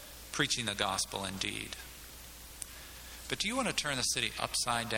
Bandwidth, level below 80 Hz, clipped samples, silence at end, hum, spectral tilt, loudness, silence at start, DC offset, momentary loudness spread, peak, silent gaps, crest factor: 18 kHz; -56 dBFS; under 0.1%; 0 s; none; -2 dB/octave; -33 LUFS; 0 s; under 0.1%; 16 LU; -12 dBFS; none; 24 dB